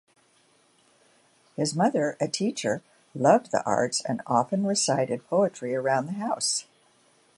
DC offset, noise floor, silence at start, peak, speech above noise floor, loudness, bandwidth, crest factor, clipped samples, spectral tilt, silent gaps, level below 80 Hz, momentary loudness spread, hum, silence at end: under 0.1%; -63 dBFS; 1.6 s; -6 dBFS; 38 dB; -26 LUFS; 11.5 kHz; 22 dB; under 0.1%; -4 dB/octave; none; -72 dBFS; 8 LU; none; 0.75 s